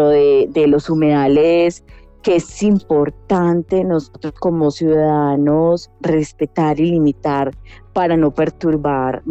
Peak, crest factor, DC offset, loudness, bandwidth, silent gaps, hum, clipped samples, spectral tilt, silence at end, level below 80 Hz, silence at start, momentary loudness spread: -6 dBFS; 10 dB; under 0.1%; -16 LUFS; 8.4 kHz; none; none; under 0.1%; -7.5 dB/octave; 0 s; -42 dBFS; 0 s; 7 LU